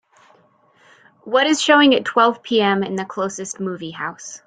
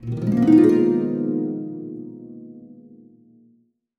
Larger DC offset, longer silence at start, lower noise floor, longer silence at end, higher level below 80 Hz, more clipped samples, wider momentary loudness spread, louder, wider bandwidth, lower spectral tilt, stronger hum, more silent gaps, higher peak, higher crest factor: neither; first, 1.25 s vs 0 s; second, -56 dBFS vs -61 dBFS; second, 0.1 s vs 1.25 s; second, -66 dBFS vs -58 dBFS; neither; second, 14 LU vs 25 LU; about the same, -18 LUFS vs -18 LUFS; first, 9.4 kHz vs 6.6 kHz; second, -3.5 dB/octave vs -9.5 dB/octave; neither; neither; about the same, -2 dBFS vs -4 dBFS; about the same, 18 dB vs 18 dB